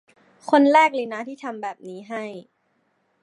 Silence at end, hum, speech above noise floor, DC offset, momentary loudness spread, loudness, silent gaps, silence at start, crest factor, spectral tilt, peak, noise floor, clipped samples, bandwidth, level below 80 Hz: 0.8 s; none; 47 dB; under 0.1%; 22 LU; -21 LUFS; none; 0.45 s; 20 dB; -4.5 dB/octave; -2 dBFS; -68 dBFS; under 0.1%; 11 kHz; -84 dBFS